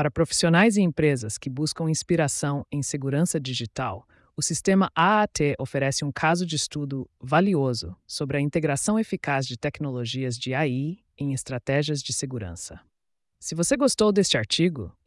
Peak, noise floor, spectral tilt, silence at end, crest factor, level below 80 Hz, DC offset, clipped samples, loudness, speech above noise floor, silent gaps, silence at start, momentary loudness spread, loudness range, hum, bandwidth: -10 dBFS; -76 dBFS; -4.5 dB/octave; 0.15 s; 16 dB; -56 dBFS; under 0.1%; under 0.1%; -25 LUFS; 51 dB; none; 0 s; 12 LU; 5 LU; none; 12 kHz